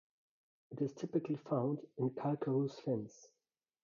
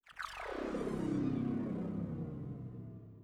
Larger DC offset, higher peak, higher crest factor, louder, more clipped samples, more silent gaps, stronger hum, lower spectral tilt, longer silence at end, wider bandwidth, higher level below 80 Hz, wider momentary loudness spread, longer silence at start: neither; about the same, -24 dBFS vs -26 dBFS; about the same, 16 dB vs 14 dB; about the same, -39 LUFS vs -40 LUFS; neither; neither; neither; first, -9 dB/octave vs -7.5 dB/octave; first, 0.55 s vs 0 s; second, 7.2 kHz vs 13.5 kHz; second, -84 dBFS vs -58 dBFS; second, 5 LU vs 11 LU; first, 0.7 s vs 0.05 s